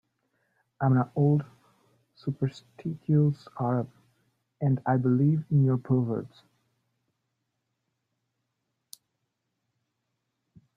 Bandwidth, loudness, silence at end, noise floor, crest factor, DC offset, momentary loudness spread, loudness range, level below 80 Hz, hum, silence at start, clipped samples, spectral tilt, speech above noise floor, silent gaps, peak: 9.8 kHz; -27 LUFS; 4.5 s; -81 dBFS; 18 dB; under 0.1%; 13 LU; 4 LU; -68 dBFS; none; 0.8 s; under 0.1%; -10 dB/octave; 55 dB; none; -12 dBFS